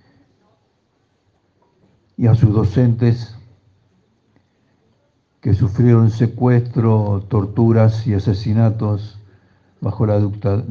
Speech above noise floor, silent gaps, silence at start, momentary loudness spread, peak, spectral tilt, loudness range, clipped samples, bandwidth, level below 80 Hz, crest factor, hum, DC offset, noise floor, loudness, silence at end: 48 dB; none; 2.2 s; 12 LU; 0 dBFS; -10 dB/octave; 4 LU; under 0.1%; 6.6 kHz; -52 dBFS; 18 dB; none; under 0.1%; -63 dBFS; -16 LUFS; 0 s